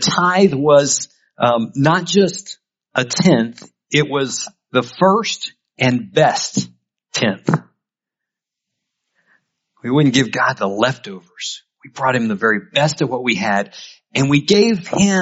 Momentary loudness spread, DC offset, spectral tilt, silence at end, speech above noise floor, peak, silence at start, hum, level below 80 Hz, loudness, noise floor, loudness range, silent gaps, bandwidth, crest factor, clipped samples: 14 LU; under 0.1%; -4.5 dB/octave; 0 s; 69 dB; 0 dBFS; 0 s; none; -56 dBFS; -17 LUFS; -85 dBFS; 5 LU; none; 8 kHz; 18 dB; under 0.1%